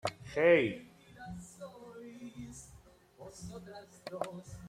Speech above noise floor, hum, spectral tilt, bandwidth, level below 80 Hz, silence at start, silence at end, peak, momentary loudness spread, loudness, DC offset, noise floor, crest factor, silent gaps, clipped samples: 27 dB; none; -5 dB/octave; 14 kHz; -64 dBFS; 0.05 s; 0 s; -14 dBFS; 25 LU; -31 LUFS; under 0.1%; -59 dBFS; 24 dB; none; under 0.1%